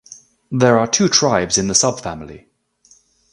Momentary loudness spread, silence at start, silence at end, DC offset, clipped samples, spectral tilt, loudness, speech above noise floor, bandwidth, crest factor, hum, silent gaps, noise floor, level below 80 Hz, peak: 16 LU; 0.1 s; 0.95 s; under 0.1%; under 0.1%; -3 dB/octave; -15 LUFS; 38 dB; 11.5 kHz; 18 dB; none; none; -54 dBFS; -48 dBFS; 0 dBFS